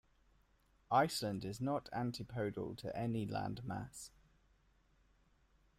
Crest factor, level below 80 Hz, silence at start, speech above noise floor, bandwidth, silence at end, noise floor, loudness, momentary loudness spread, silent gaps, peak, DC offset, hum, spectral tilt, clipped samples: 22 dB; -68 dBFS; 0.9 s; 34 dB; 15.5 kHz; 1.7 s; -73 dBFS; -40 LUFS; 12 LU; none; -20 dBFS; under 0.1%; none; -5.5 dB/octave; under 0.1%